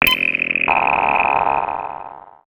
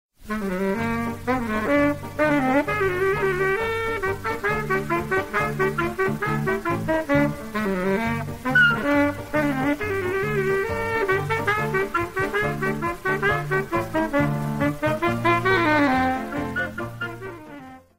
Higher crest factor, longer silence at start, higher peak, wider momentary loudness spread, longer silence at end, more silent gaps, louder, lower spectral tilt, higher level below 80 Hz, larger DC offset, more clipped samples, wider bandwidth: about the same, 18 dB vs 16 dB; second, 0 s vs 0.2 s; first, -2 dBFS vs -6 dBFS; first, 15 LU vs 8 LU; about the same, 0.15 s vs 0.15 s; neither; first, -16 LUFS vs -23 LUFS; second, -3 dB/octave vs -6 dB/octave; about the same, -46 dBFS vs -44 dBFS; second, under 0.1% vs 0.4%; neither; first, over 20 kHz vs 16 kHz